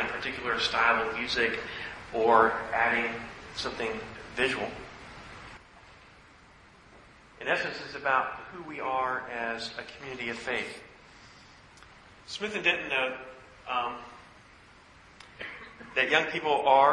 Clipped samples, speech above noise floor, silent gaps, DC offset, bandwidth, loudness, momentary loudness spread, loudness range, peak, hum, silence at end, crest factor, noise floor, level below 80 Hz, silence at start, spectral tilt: under 0.1%; 27 dB; none; under 0.1%; 11 kHz; -29 LUFS; 21 LU; 10 LU; -6 dBFS; none; 0 s; 24 dB; -55 dBFS; -60 dBFS; 0 s; -3.5 dB/octave